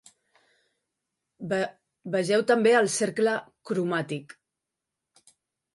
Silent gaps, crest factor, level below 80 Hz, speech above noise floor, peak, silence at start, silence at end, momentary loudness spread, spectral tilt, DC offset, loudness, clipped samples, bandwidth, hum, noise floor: none; 18 dB; -76 dBFS; 61 dB; -10 dBFS; 1.4 s; 1.45 s; 14 LU; -4.5 dB/octave; under 0.1%; -26 LUFS; under 0.1%; 11.5 kHz; none; -86 dBFS